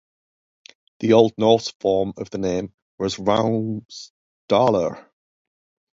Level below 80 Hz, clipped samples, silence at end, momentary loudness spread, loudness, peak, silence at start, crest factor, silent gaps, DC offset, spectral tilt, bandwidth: -54 dBFS; under 0.1%; 0.95 s; 16 LU; -21 LUFS; 0 dBFS; 1 s; 22 dB; 1.75-1.80 s, 2.74-2.98 s, 3.85-3.89 s, 4.10-4.48 s; under 0.1%; -6 dB/octave; 7.8 kHz